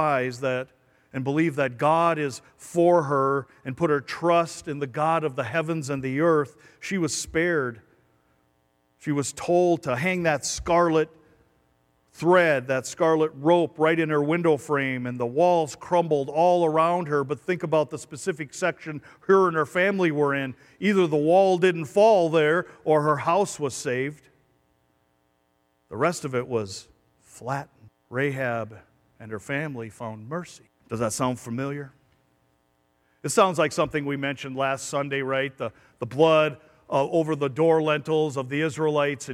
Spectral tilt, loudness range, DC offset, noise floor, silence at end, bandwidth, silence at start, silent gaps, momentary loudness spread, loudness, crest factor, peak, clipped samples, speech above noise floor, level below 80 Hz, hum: -5.5 dB/octave; 10 LU; under 0.1%; -69 dBFS; 0 s; 15 kHz; 0 s; none; 14 LU; -24 LUFS; 18 dB; -6 dBFS; under 0.1%; 45 dB; -60 dBFS; none